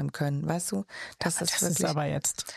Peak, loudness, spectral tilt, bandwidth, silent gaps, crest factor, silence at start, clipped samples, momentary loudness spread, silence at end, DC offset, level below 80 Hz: -12 dBFS; -28 LUFS; -3.5 dB/octave; 15.5 kHz; none; 18 dB; 0 s; under 0.1%; 7 LU; 0 s; under 0.1%; -62 dBFS